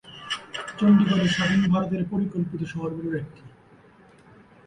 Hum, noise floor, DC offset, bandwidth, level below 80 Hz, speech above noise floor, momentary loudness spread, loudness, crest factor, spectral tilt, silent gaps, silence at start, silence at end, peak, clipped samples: none; -53 dBFS; under 0.1%; 10 kHz; -56 dBFS; 31 dB; 14 LU; -24 LUFS; 16 dB; -6.5 dB/octave; none; 0.05 s; 1.2 s; -8 dBFS; under 0.1%